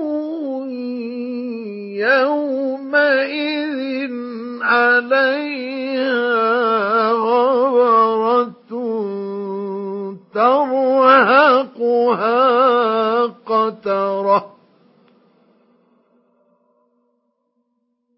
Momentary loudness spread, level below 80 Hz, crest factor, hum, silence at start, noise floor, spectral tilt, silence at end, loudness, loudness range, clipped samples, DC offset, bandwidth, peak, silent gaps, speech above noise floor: 12 LU; -82 dBFS; 18 dB; none; 0 s; -69 dBFS; -9.5 dB/octave; 3.7 s; -17 LUFS; 7 LU; under 0.1%; under 0.1%; 5.8 kHz; 0 dBFS; none; 53 dB